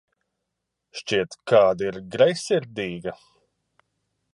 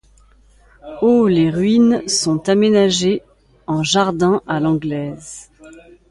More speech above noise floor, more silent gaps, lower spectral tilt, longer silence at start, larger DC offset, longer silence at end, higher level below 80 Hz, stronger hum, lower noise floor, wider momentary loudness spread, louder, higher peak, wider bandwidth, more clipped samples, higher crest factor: first, 59 dB vs 34 dB; neither; about the same, -4.5 dB/octave vs -5 dB/octave; about the same, 0.95 s vs 0.85 s; neither; first, 1.2 s vs 0.3 s; second, -62 dBFS vs -50 dBFS; neither; first, -81 dBFS vs -50 dBFS; about the same, 17 LU vs 17 LU; second, -23 LUFS vs -16 LUFS; about the same, -4 dBFS vs -2 dBFS; about the same, 11.5 kHz vs 11.5 kHz; neither; about the same, 20 dB vs 16 dB